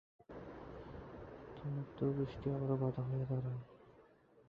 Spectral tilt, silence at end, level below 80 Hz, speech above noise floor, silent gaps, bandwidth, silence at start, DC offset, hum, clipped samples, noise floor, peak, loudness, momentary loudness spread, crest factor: -9.5 dB/octave; 0.05 s; -62 dBFS; 27 dB; none; 5.2 kHz; 0.3 s; under 0.1%; none; under 0.1%; -66 dBFS; -24 dBFS; -41 LUFS; 15 LU; 18 dB